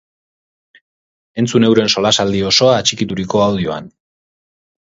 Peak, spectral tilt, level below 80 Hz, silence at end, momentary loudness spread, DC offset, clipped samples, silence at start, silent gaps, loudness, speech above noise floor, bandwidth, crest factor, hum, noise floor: 0 dBFS; -4 dB/octave; -48 dBFS; 1 s; 10 LU; under 0.1%; under 0.1%; 1.35 s; none; -14 LUFS; over 76 dB; 8 kHz; 16 dB; none; under -90 dBFS